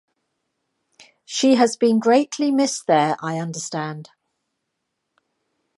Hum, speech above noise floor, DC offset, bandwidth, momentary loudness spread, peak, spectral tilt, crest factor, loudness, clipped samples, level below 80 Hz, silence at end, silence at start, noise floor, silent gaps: none; 58 dB; under 0.1%; 11.5 kHz; 12 LU; -4 dBFS; -4.5 dB/octave; 18 dB; -19 LUFS; under 0.1%; -76 dBFS; 1.75 s; 1.3 s; -78 dBFS; none